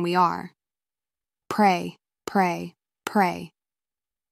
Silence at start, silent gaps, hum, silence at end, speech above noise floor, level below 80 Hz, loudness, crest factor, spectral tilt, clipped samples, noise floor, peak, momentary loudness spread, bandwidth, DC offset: 0 s; none; none; 0.85 s; over 67 dB; -70 dBFS; -24 LUFS; 20 dB; -5.5 dB/octave; under 0.1%; under -90 dBFS; -6 dBFS; 19 LU; 15.5 kHz; under 0.1%